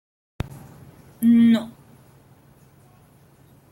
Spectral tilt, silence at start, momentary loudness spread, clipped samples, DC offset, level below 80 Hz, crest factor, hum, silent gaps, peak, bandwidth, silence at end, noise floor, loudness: -7 dB/octave; 1.2 s; 23 LU; under 0.1%; under 0.1%; -52 dBFS; 16 dB; none; none; -10 dBFS; 13.5 kHz; 2.05 s; -53 dBFS; -18 LUFS